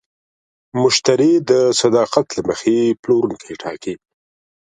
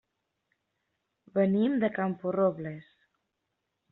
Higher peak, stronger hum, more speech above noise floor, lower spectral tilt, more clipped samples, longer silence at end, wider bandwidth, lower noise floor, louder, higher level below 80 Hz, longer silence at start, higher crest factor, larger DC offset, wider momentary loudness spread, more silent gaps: first, 0 dBFS vs -14 dBFS; neither; first, over 74 dB vs 55 dB; second, -4.5 dB/octave vs -7 dB/octave; neither; second, 0.75 s vs 1.1 s; first, 11 kHz vs 4.1 kHz; first, under -90 dBFS vs -82 dBFS; first, -16 LUFS vs -28 LUFS; first, -58 dBFS vs -72 dBFS; second, 0.75 s vs 1.35 s; about the same, 16 dB vs 18 dB; neither; about the same, 15 LU vs 14 LU; first, 2.99-3.03 s vs none